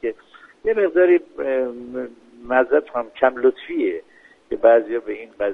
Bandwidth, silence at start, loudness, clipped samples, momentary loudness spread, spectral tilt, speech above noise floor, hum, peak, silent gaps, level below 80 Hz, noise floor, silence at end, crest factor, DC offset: 3.9 kHz; 0.05 s; -20 LUFS; under 0.1%; 16 LU; -7 dB/octave; 29 dB; none; -2 dBFS; none; -56 dBFS; -48 dBFS; 0 s; 18 dB; under 0.1%